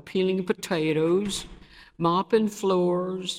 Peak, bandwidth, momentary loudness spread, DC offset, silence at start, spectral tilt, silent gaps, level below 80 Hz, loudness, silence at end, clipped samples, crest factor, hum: -8 dBFS; 15.5 kHz; 6 LU; under 0.1%; 0.05 s; -5.5 dB/octave; none; -56 dBFS; -25 LUFS; 0 s; under 0.1%; 18 dB; none